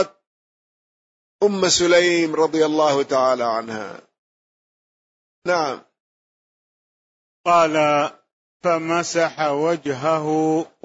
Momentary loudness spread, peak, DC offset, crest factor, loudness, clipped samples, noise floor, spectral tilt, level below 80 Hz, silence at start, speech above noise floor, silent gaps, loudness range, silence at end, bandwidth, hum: 11 LU; -6 dBFS; under 0.1%; 16 dB; -19 LUFS; under 0.1%; under -90 dBFS; -3.5 dB/octave; -64 dBFS; 0 s; over 71 dB; 0.27-1.39 s, 4.18-5.42 s, 6.00-7.44 s, 8.33-8.60 s; 11 LU; 0.2 s; 8 kHz; none